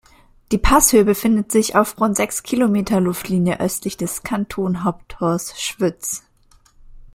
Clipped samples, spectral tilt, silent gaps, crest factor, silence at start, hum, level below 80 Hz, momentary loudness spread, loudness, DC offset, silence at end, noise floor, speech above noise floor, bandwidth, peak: under 0.1%; -4.5 dB/octave; none; 18 dB; 0.5 s; none; -34 dBFS; 11 LU; -18 LUFS; under 0.1%; 0.1 s; -53 dBFS; 35 dB; 16.5 kHz; 0 dBFS